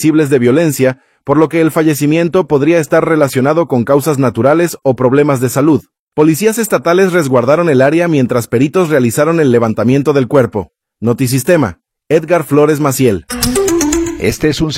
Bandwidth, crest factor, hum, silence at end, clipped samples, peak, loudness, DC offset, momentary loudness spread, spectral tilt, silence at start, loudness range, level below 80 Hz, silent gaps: 16.5 kHz; 10 dB; none; 0 s; 0.1%; 0 dBFS; -11 LUFS; under 0.1%; 5 LU; -6 dB/octave; 0 s; 2 LU; -38 dBFS; 5.99-6.07 s